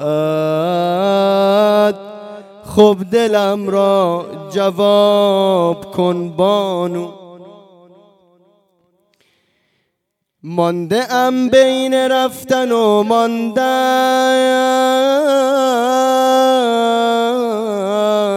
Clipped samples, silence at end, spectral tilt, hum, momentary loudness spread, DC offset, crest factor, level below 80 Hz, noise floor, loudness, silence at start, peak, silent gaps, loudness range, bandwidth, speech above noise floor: under 0.1%; 0 s; -5 dB/octave; none; 7 LU; under 0.1%; 14 dB; -60 dBFS; -73 dBFS; -14 LUFS; 0 s; 0 dBFS; none; 9 LU; 16.5 kHz; 60 dB